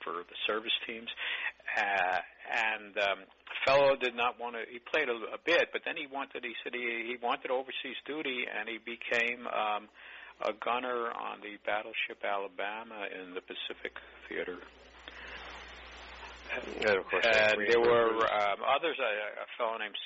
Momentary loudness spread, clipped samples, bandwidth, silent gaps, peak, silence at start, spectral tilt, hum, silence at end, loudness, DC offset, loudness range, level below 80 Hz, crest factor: 17 LU; under 0.1%; 7.6 kHz; none; -14 dBFS; 0 s; 0 dB/octave; none; 0 s; -32 LUFS; under 0.1%; 11 LU; -66 dBFS; 20 dB